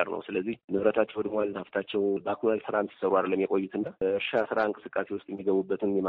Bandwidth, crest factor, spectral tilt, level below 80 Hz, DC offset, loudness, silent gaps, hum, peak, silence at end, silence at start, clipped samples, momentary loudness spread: 4.8 kHz; 18 dB; -4.5 dB/octave; -68 dBFS; under 0.1%; -29 LUFS; 0.64-0.68 s; none; -10 dBFS; 0 s; 0 s; under 0.1%; 6 LU